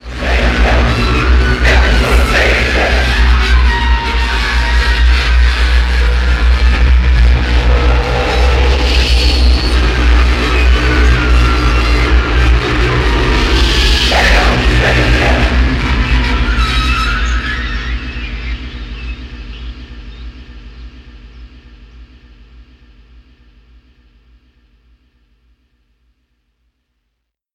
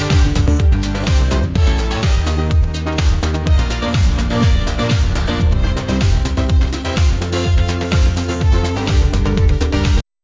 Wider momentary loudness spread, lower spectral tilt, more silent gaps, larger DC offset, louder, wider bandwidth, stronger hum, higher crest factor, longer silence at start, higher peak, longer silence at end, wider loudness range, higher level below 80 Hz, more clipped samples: first, 13 LU vs 3 LU; about the same, -5 dB/octave vs -6 dB/octave; neither; neither; first, -12 LUFS vs -16 LUFS; first, 11 kHz vs 7.8 kHz; neither; about the same, 12 dB vs 12 dB; about the same, 0.05 s vs 0 s; about the same, 0 dBFS vs -2 dBFS; first, 4.9 s vs 0.2 s; first, 13 LU vs 1 LU; about the same, -12 dBFS vs -16 dBFS; neither